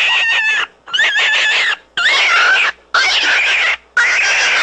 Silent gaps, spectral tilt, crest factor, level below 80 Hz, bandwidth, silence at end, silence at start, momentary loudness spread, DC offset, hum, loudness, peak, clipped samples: none; 2 dB/octave; 12 dB; -54 dBFS; 9.6 kHz; 0 s; 0 s; 5 LU; under 0.1%; none; -11 LUFS; -2 dBFS; under 0.1%